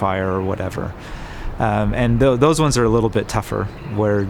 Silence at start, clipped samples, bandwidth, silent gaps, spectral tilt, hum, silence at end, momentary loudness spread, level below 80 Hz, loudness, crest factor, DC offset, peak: 0 s; under 0.1%; 17 kHz; none; -6 dB/octave; none; 0 s; 15 LU; -32 dBFS; -19 LUFS; 16 dB; under 0.1%; -2 dBFS